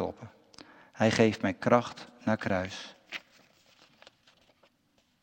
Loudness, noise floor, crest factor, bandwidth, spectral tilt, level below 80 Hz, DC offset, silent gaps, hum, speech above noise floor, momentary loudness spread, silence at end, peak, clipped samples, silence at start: -29 LUFS; -71 dBFS; 24 dB; 16 kHz; -5.5 dB/octave; -70 dBFS; under 0.1%; none; none; 43 dB; 24 LU; 2.05 s; -8 dBFS; under 0.1%; 0 s